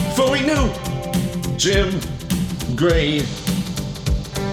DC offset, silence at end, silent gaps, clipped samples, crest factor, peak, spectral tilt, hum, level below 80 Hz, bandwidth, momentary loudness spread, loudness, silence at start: under 0.1%; 0 s; none; under 0.1%; 16 dB; -4 dBFS; -5 dB/octave; none; -30 dBFS; 18.5 kHz; 7 LU; -20 LUFS; 0 s